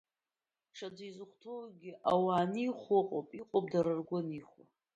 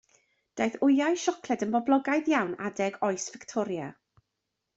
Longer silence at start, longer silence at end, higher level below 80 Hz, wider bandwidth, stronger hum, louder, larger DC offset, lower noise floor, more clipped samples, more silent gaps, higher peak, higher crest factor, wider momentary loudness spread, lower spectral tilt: first, 0.75 s vs 0.55 s; second, 0.5 s vs 0.85 s; about the same, -76 dBFS vs -72 dBFS; about the same, 8.4 kHz vs 8 kHz; neither; second, -34 LUFS vs -28 LUFS; neither; first, under -90 dBFS vs -83 dBFS; neither; neither; second, -18 dBFS vs -12 dBFS; about the same, 18 dB vs 18 dB; first, 17 LU vs 10 LU; first, -7.5 dB/octave vs -4.5 dB/octave